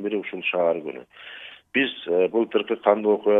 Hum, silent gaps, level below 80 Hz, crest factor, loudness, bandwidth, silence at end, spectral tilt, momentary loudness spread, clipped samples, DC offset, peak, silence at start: none; none; -76 dBFS; 20 dB; -23 LUFS; 4 kHz; 0 s; -7.5 dB/octave; 18 LU; under 0.1%; under 0.1%; -4 dBFS; 0 s